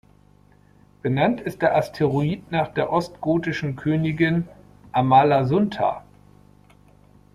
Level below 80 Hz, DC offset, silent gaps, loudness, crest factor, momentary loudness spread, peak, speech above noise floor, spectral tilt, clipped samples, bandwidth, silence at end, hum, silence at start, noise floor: -54 dBFS; under 0.1%; none; -22 LUFS; 18 dB; 10 LU; -4 dBFS; 34 dB; -8 dB/octave; under 0.1%; 13.5 kHz; 1.35 s; 50 Hz at -45 dBFS; 1.05 s; -54 dBFS